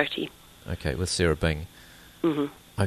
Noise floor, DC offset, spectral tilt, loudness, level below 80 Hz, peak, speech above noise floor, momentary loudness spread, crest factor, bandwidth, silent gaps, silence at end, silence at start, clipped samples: -50 dBFS; under 0.1%; -5 dB/octave; -28 LUFS; -42 dBFS; -8 dBFS; 23 dB; 21 LU; 22 dB; 13.5 kHz; none; 0 s; 0 s; under 0.1%